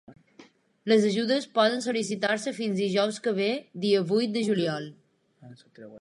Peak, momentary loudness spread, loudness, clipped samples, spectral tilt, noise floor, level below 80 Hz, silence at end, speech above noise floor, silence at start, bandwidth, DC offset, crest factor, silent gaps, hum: -8 dBFS; 7 LU; -26 LUFS; under 0.1%; -5 dB/octave; -56 dBFS; -78 dBFS; 0 s; 30 dB; 0.1 s; 11.5 kHz; under 0.1%; 18 dB; none; none